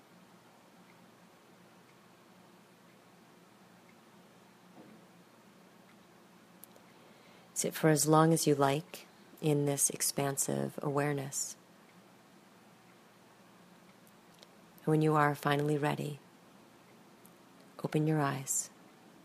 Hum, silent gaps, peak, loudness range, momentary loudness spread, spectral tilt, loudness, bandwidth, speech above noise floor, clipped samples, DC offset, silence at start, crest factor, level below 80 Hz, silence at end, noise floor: none; none; -12 dBFS; 10 LU; 18 LU; -4.5 dB/octave; -31 LUFS; 15.5 kHz; 30 dB; under 0.1%; under 0.1%; 4.75 s; 24 dB; -78 dBFS; 0.55 s; -60 dBFS